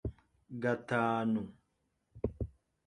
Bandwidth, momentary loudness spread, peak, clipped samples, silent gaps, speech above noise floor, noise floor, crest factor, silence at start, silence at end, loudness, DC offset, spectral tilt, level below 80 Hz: 10 kHz; 14 LU; -18 dBFS; under 0.1%; none; 47 dB; -80 dBFS; 18 dB; 0.05 s; 0.35 s; -36 LUFS; under 0.1%; -8 dB/octave; -52 dBFS